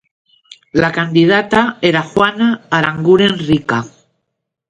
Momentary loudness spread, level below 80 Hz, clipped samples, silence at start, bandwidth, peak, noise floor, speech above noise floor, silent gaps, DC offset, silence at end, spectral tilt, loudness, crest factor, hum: 7 LU; -48 dBFS; under 0.1%; 0.75 s; 10.5 kHz; 0 dBFS; -74 dBFS; 61 dB; none; under 0.1%; 0.8 s; -6 dB/octave; -13 LUFS; 14 dB; none